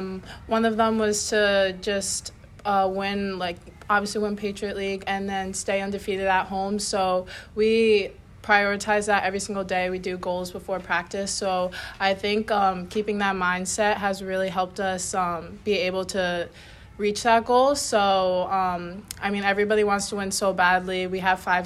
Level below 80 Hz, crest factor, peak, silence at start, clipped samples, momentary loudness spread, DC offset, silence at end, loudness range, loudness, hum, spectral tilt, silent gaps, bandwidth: -52 dBFS; 18 dB; -6 dBFS; 0 s; under 0.1%; 9 LU; under 0.1%; 0 s; 4 LU; -24 LUFS; none; -3.5 dB/octave; none; 14 kHz